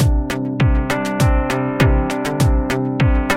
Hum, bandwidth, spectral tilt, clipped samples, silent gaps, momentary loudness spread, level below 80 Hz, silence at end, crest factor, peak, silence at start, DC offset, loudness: none; 16 kHz; -6.5 dB/octave; under 0.1%; none; 4 LU; -20 dBFS; 0 s; 16 dB; 0 dBFS; 0 s; under 0.1%; -18 LUFS